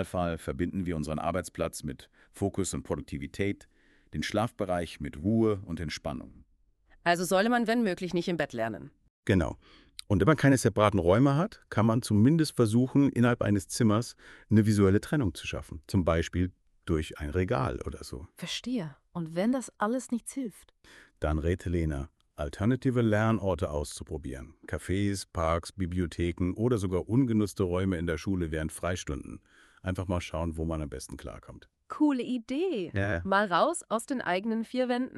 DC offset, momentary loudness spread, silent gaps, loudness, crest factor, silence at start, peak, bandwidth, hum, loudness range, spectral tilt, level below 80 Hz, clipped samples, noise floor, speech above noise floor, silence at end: under 0.1%; 15 LU; 9.10-9.23 s; -29 LUFS; 20 dB; 0 s; -8 dBFS; 13.5 kHz; none; 8 LU; -6 dB/octave; -46 dBFS; under 0.1%; -66 dBFS; 37 dB; 0 s